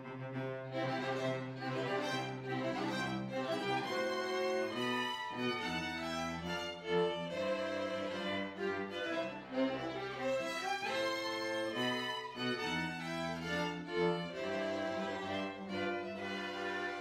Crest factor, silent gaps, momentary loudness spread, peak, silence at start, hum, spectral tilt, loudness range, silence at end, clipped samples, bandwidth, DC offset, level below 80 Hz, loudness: 16 dB; none; 4 LU; -22 dBFS; 0 s; none; -5 dB/octave; 1 LU; 0 s; under 0.1%; 16 kHz; under 0.1%; -70 dBFS; -38 LUFS